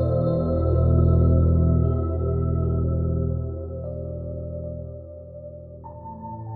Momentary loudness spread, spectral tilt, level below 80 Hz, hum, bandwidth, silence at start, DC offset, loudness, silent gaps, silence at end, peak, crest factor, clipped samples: 21 LU; -13.5 dB/octave; -30 dBFS; none; 1.4 kHz; 0 s; under 0.1%; -23 LUFS; none; 0 s; -8 dBFS; 14 dB; under 0.1%